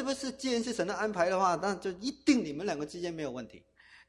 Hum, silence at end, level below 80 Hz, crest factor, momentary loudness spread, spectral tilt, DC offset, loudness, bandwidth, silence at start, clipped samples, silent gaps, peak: none; 0.1 s; -64 dBFS; 18 dB; 10 LU; -4 dB/octave; under 0.1%; -32 LUFS; 14 kHz; 0 s; under 0.1%; none; -14 dBFS